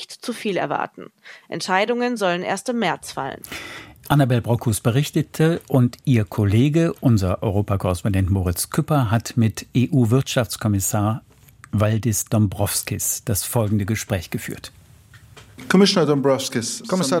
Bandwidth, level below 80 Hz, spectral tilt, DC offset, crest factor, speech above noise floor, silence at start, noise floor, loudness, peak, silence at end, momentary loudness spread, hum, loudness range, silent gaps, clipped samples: 16.5 kHz; -48 dBFS; -5.5 dB/octave; under 0.1%; 18 dB; 28 dB; 0 s; -48 dBFS; -21 LUFS; -2 dBFS; 0 s; 12 LU; none; 4 LU; none; under 0.1%